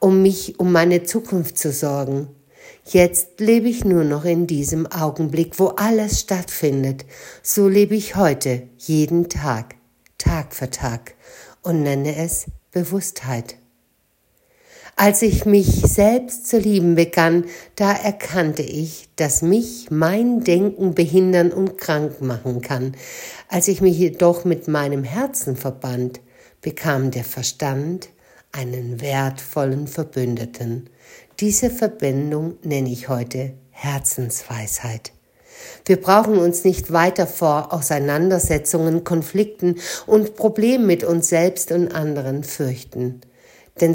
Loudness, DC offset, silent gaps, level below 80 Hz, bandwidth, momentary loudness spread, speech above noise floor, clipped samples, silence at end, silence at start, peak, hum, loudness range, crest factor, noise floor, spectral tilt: -19 LUFS; under 0.1%; none; -40 dBFS; 17 kHz; 12 LU; 45 dB; under 0.1%; 0 s; 0 s; 0 dBFS; none; 7 LU; 18 dB; -64 dBFS; -5.5 dB/octave